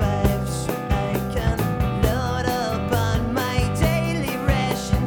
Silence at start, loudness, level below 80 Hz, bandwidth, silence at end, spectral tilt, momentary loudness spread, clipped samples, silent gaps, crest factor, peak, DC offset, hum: 0 s; -23 LUFS; -30 dBFS; over 20 kHz; 0 s; -6 dB/octave; 3 LU; under 0.1%; none; 18 dB; -4 dBFS; under 0.1%; none